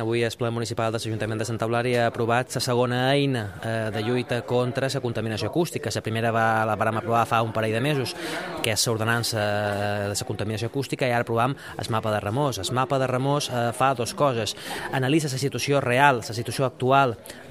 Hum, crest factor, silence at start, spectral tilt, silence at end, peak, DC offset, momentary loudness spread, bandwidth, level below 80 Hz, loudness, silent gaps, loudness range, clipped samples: none; 22 dB; 0 s; -5 dB/octave; 0 s; -2 dBFS; under 0.1%; 7 LU; 16 kHz; -58 dBFS; -24 LUFS; none; 2 LU; under 0.1%